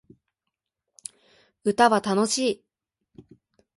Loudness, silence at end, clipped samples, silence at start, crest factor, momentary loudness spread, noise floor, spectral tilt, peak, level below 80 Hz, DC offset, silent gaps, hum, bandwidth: -23 LUFS; 1.2 s; under 0.1%; 1.65 s; 22 dB; 22 LU; -84 dBFS; -3.5 dB/octave; -6 dBFS; -68 dBFS; under 0.1%; none; none; 11.5 kHz